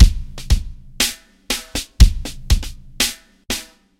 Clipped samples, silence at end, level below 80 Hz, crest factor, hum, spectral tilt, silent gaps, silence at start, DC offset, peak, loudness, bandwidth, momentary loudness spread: 0.5%; 0.35 s; -20 dBFS; 18 dB; none; -3.5 dB/octave; none; 0 s; under 0.1%; 0 dBFS; -20 LUFS; 16.5 kHz; 18 LU